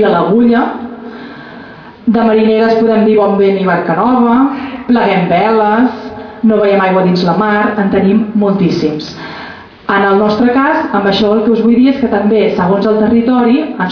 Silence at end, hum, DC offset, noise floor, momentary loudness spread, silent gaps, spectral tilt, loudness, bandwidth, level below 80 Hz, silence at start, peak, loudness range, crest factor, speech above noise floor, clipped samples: 0 s; none; under 0.1%; -32 dBFS; 15 LU; none; -8 dB/octave; -10 LUFS; 5.4 kHz; -44 dBFS; 0 s; 0 dBFS; 2 LU; 10 dB; 22 dB; under 0.1%